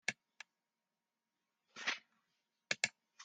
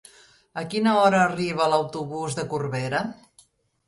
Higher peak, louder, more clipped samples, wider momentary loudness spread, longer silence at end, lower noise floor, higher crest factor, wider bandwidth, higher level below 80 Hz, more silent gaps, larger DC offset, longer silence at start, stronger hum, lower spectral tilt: second, -16 dBFS vs -6 dBFS; second, -41 LUFS vs -23 LUFS; neither; first, 20 LU vs 13 LU; second, 0 s vs 0.75 s; first, under -90 dBFS vs -59 dBFS; first, 32 dB vs 18 dB; second, 10 kHz vs 11.5 kHz; second, under -90 dBFS vs -62 dBFS; neither; neither; second, 0.1 s vs 0.55 s; neither; second, 0 dB/octave vs -5.5 dB/octave